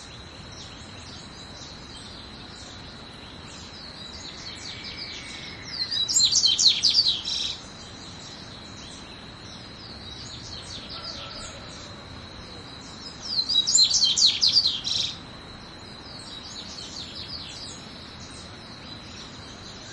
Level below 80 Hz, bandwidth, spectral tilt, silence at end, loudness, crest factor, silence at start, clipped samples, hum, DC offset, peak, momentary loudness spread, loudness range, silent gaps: -54 dBFS; 12 kHz; -0.5 dB/octave; 0 s; -22 LUFS; 22 dB; 0 s; under 0.1%; none; under 0.1%; -6 dBFS; 23 LU; 18 LU; none